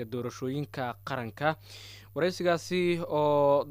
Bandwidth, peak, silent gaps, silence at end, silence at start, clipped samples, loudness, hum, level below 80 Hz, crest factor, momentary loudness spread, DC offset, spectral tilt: 16 kHz; -12 dBFS; none; 0 s; 0 s; under 0.1%; -30 LUFS; none; -64 dBFS; 16 dB; 14 LU; under 0.1%; -6 dB/octave